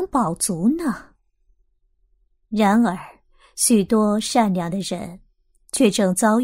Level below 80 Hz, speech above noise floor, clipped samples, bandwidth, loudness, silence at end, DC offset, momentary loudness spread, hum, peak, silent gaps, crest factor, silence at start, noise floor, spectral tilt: -52 dBFS; 45 dB; under 0.1%; 16 kHz; -20 LUFS; 0 s; under 0.1%; 13 LU; none; -4 dBFS; none; 18 dB; 0 s; -64 dBFS; -4.5 dB/octave